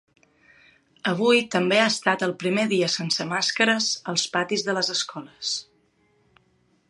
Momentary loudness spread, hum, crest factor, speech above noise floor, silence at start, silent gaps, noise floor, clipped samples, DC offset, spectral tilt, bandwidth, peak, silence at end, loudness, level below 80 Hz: 9 LU; none; 22 dB; 41 dB; 1.05 s; none; -65 dBFS; under 0.1%; under 0.1%; -3 dB/octave; 11.5 kHz; -4 dBFS; 1.3 s; -23 LUFS; -74 dBFS